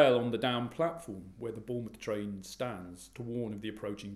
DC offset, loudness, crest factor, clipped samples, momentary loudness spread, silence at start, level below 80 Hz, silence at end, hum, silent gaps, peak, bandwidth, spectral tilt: under 0.1%; -36 LUFS; 24 dB; under 0.1%; 13 LU; 0 s; -64 dBFS; 0 s; none; none; -10 dBFS; 15 kHz; -5.5 dB/octave